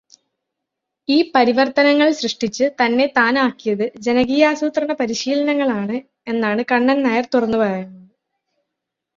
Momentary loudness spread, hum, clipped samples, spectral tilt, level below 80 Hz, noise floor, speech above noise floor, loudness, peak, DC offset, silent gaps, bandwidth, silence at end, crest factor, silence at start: 7 LU; none; under 0.1%; -4.5 dB/octave; -60 dBFS; -81 dBFS; 64 dB; -17 LUFS; 0 dBFS; under 0.1%; none; 7.6 kHz; 1.2 s; 18 dB; 1.1 s